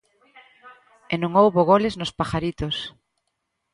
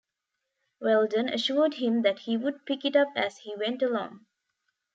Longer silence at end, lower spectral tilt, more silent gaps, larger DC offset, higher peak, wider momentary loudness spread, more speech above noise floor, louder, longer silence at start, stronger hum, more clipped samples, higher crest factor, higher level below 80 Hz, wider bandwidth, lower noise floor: about the same, 0.85 s vs 0.75 s; first, -6.5 dB/octave vs -5 dB/octave; neither; neither; first, -4 dBFS vs -10 dBFS; first, 12 LU vs 8 LU; about the same, 56 dB vs 57 dB; first, -21 LUFS vs -27 LUFS; second, 0.65 s vs 0.8 s; neither; neither; about the same, 20 dB vs 18 dB; first, -48 dBFS vs -82 dBFS; first, 11.5 kHz vs 7.8 kHz; second, -77 dBFS vs -84 dBFS